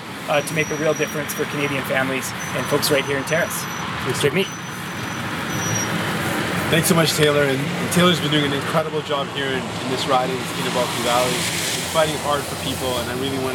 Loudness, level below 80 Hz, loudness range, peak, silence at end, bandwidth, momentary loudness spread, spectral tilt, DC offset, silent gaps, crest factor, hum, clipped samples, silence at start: -21 LUFS; -52 dBFS; 3 LU; -2 dBFS; 0 s; 19 kHz; 8 LU; -4 dB/octave; under 0.1%; none; 18 dB; none; under 0.1%; 0 s